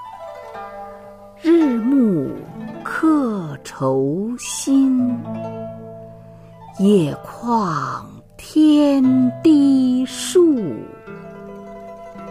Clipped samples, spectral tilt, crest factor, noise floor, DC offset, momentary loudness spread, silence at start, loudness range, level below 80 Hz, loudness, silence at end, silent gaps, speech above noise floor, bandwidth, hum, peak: under 0.1%; -6 dB/octave; 14 dB; -40 dBFS; under 0.1%; 22 LU; 0 s; 5 LU; -54 dBFS; -17 LUFS; 0 s; none; 24 dB; 15 kHz; none; -4 dBFS